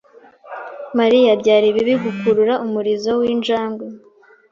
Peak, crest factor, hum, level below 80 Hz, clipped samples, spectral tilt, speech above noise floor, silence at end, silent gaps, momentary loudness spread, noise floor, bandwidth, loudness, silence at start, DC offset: -2 dBFS; 16 dB; none; -60 dBFS; under 0.1%; -5.5 dB/octave; 27 dB; 0.55 s; none; 19 LU; -43 dBFS; 7.4 kHz; -16 LUFS; 0.45 s; under 0.1%